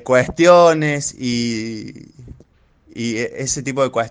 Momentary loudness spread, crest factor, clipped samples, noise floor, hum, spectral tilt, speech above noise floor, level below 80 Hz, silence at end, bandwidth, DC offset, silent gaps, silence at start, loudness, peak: 18 LU; 18 dB; under 0.1%; -53 dBFS; none; -4.5 dB/octave; 36 dB; -48 dBFS; 0 s; 10 kHz; under 0.1%; none; 0.05 s; -16 LUFS; 0 dBFS